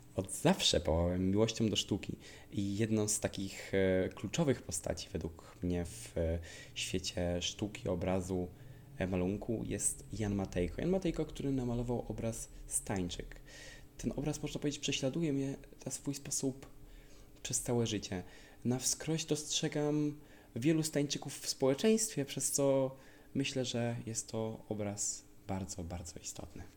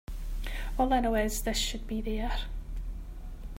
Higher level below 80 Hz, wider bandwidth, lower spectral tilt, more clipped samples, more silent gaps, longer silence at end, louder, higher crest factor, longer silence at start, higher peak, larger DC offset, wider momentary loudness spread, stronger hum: second, -56 dBFS vs -34 dBFS; about the same, 17 kHz vs 16 kHz; about the same, -4.5 dB/octave vs -4 dB/octave; neither; neither; about the same, 0 s vs 0 s; second, -36 LUFS vs -32 LUFS; about the same, 20 dB vs 18 dB; about the same, 0 s vs 0.1 s; about the same, -16 dBFS vs -14 dBFS; neither; second, 12 LU vs 16 LU; neither